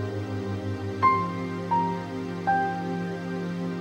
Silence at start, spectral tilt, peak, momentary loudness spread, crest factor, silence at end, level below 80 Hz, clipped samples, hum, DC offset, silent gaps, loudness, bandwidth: 0 s; -7.5 dB/octave; -8 dBFS; 9 LU; 18 dB; 0 s; -60 dBFS; under 0.1%; none; under 0.1%; none; -28 LUFS; 10 kHz